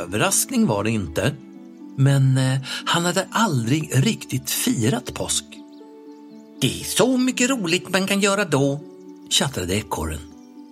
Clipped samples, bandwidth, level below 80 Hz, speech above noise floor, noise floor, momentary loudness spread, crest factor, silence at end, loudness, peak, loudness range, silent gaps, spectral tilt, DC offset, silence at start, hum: under 0.1%; 16 kHz; -48 dBFS; 21 dB; -42 dBFS; 10 LU; 20 dB; 0.05 s; -21 LUFS; -2 dBFS; 3 LU; none; -4 dB/octave; under 0.1%; 0 s; none